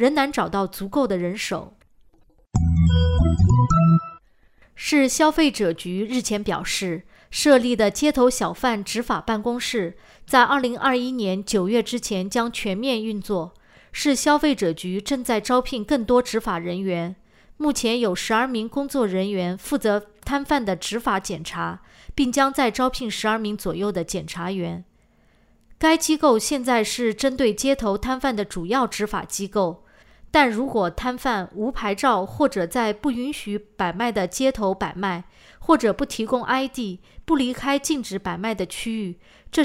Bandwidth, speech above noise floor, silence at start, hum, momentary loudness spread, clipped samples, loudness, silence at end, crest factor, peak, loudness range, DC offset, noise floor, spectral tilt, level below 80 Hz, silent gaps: 16 kHz; 36 dB; 0 s; none; 10 LU; under 0.1%; -22 LUFS; 0 s; 20 dB; -2 dBFS; 3 LU; under 0.1%; -58 dBFS; -5 dB/octave; -40 dBFS; none